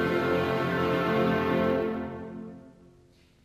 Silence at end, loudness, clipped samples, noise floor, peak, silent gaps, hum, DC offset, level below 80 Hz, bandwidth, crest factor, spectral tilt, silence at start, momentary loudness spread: 0.75 s; -27 LUFS; under 0.1%; -59 dBFS; -14 dBFS; none; none; under 0.1%; -56 dBFS; 15.5 kHz; 14 dB; -7 dB/octave; 0 s; 15 LU